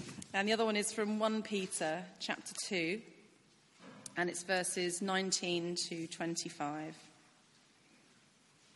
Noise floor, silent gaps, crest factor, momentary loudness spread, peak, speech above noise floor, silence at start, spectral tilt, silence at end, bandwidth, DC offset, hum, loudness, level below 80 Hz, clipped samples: -67 dBFS; none; 20 dB; 9 LU; -18 dBFS; 30 dB; 0 s; -3 dB/octave; 1.65 s; 11.5 kHz; under 0.1%; none; -36 LUFS; -84 dBFS; under 0.1%